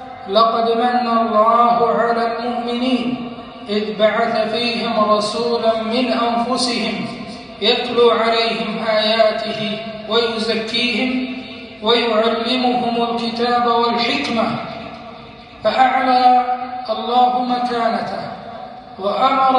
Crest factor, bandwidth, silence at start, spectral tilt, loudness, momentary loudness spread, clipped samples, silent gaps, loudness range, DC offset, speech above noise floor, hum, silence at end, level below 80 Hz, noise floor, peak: 16 dB; 11 kHz; 0 s; -4.5 dB/octave; -17 LUFS; 14 LU; under 0.1%; none; 2 LU; under 0.1%; 21 dB; none; 0 s; -54 dBFS; -37 dBFS; -2 dBFS